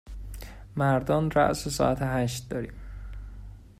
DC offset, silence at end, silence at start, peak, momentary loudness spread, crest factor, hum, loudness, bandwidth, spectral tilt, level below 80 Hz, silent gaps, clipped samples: under 0.1%; 0.1 s; 0.05 s; -10 dBFS; 19 LU; 20 dB; none; -27 LUFS; 16 kHz; -6 dB/octave; -42 dBFS; none; under 0.1%